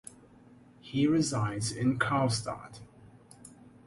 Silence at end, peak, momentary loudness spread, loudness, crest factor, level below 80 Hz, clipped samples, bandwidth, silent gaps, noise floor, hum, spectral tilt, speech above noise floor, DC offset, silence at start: 0.25 s; -12 dBFS; 24 LU; -30 LUFS; 20 dB; -60 dBFS; under 0.1%; 11.5 kHz; none; -57 dBFS; none; -5 dB/octave; 27 dB; under 0.1%; 0.85 s